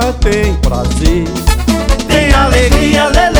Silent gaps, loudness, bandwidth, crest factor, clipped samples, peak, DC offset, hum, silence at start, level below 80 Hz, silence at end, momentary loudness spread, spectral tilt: none; -11 LUFS; over 20 kHz; 10 dB; 1%; 0 dBFS; under 0.1%; none; 0 s; -12 dBFS; 0 s; 5 LU; -5 dB/octave